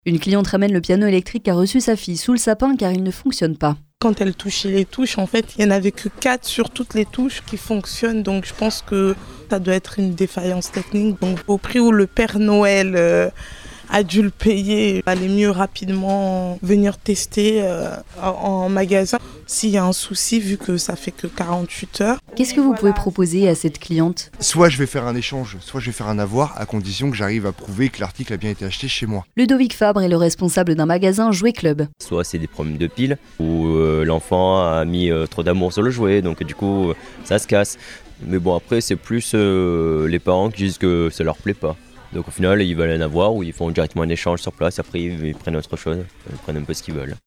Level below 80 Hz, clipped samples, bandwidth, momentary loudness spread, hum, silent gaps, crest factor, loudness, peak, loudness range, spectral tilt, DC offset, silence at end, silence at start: -38 dBFS; under 0.1%; 18.5 kHz; 9 LU; none; none; 18 dB; -19 LUFS; 0 dBFS; 4 LU; -5.5 dB/octave; under 0.1%; 0.1 s; 0.05 s